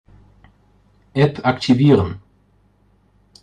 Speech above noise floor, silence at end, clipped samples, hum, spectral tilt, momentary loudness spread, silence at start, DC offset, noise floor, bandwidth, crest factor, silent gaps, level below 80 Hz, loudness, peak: 42 dB; 1.25 s; under 0.1%; 50 Hz at -45 dBFS; -7.5 dB/octave; 14 LU; 1.15 s; under 0.1%; -57 dBFS; 9.2 kHz; 18 dB; none; -52 dBFS; -17 LUFS; -2 dBFS